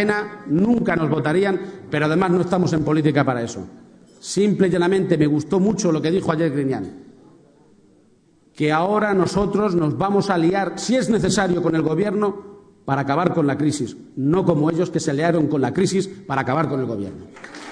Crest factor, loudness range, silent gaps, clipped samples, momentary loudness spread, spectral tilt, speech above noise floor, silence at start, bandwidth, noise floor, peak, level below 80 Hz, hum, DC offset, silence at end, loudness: 18 dB; 3 LU; none; under 0.1%; 9 LU; -6.5 dB/octave; 37 dB; 0 s; 10 kHz; -56 dBFS; -2 dBFS; -50 dBFS; none; under 0.1%; 0 s; -20 LUFS